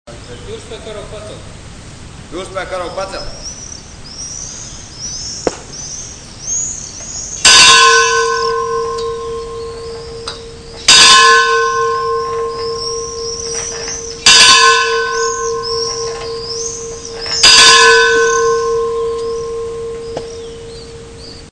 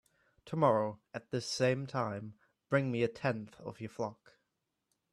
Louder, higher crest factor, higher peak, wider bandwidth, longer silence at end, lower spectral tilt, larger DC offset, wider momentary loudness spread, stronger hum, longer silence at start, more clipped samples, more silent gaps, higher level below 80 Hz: first, -9 LUFS vs -35 LUFS; second, 14 dB vs 22 dB; first, 0 dBFS vs -14 dBFS; second, 11 kHz vs 12.5 kHz; second, 0 s vs 1 s; second, 0 dB/octave vs -6 dB/octave; neither; first, 25 LU vs 15 LU; neither; second, 0.05 s vs 0.45 s; first, 0.7% vs under 0.1%; neither; first, -38 dBFS vs -74 dBFS